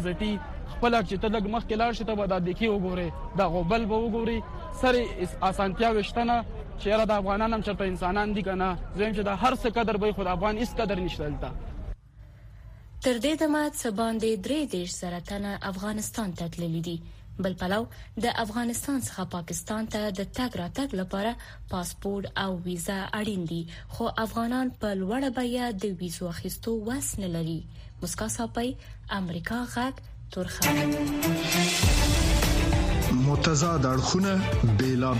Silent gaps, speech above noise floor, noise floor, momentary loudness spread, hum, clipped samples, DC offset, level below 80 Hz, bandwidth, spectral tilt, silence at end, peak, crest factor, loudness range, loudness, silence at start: none; 21 dB; -49 dBFS; 10 LU; none; under 0.1%; under 0.1%; -38 dBFS; 15.5 kHz; -5 dB/octave; 0 s; -10 dBFS; 18 dB; 8 LU; -28 LUFS; 0 s